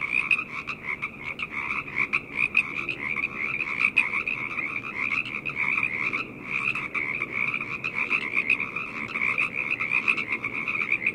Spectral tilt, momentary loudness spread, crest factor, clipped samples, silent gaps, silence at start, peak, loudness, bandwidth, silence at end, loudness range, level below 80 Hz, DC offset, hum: -4 dB/octave; 8 LU; 22 dB; under 0.1%; none; 0 s; -6 dBFS; -26 LUFS; 14.5 kHz; 0 s; 2 LU; -60 dBFS; under 0.1%; none